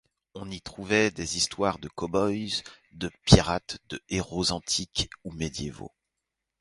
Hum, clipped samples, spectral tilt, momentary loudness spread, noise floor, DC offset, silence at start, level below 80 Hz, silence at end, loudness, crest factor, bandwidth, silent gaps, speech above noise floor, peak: none; under 0.1%; -4 dB/octave; 19 LU; -85 dBFS; under 0.1%; 0.35 s; -42 dBFS; 0.75 s; -27 LUFS; 28 dB; 11.5 kHz; none; 57 dB; 0 dBFS